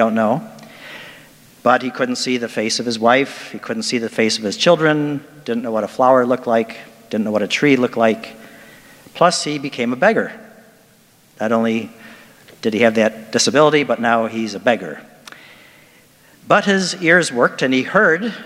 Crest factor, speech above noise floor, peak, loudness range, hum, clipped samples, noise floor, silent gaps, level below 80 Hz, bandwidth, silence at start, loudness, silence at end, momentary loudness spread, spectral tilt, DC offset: 18 dB; 35 dB; 0 dBFS; 3 LU; none; under 0.1%; -51 dBFS; none; -66 dBFS; 16 kHz; 0 s; -17 LUFS; 0 s; 14 LU; -4 dB/octave; under 0.1%